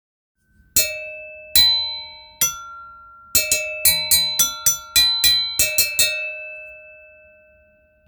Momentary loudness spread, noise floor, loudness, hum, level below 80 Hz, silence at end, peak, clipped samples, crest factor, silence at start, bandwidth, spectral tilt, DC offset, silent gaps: 20 LU; -56 dBFS; -16 LUFS; none; -50 dBFS; 1.15 s; 0 dBFS; under 0.1%; 20 dB; 0.75 s; over 20 kHz; 1.5 dB/octave; under 0.1%; none